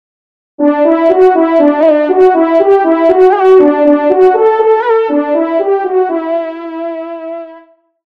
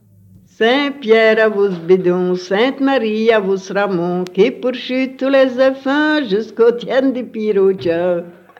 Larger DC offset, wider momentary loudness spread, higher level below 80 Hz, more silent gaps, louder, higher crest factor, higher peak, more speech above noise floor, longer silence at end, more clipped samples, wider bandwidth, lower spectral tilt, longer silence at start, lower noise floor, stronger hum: neither; first, 13 LU vs 7 LU; first, -54 dBFS vs -64 dBFS; neither; first, -9 LUFS vs -15 LUFS; about the same, 10 dB vs 14 dB; about the same, 0 dBFS vs -2 dBFS; about the same, 33 dB vs 31 dB; first, 0.5 s vs 0.3 s; first, 1% vs under 0.1%; second, 5.2 kHz vs 7.6 kHz; about the same, -6.5 dB/octave vs -6.5 dB/octave; about the same, 0.6 s vs 0.6 s; second, -41 dBFS vs -46 dBFS; second, none vs 50 Hz at -60 dBFS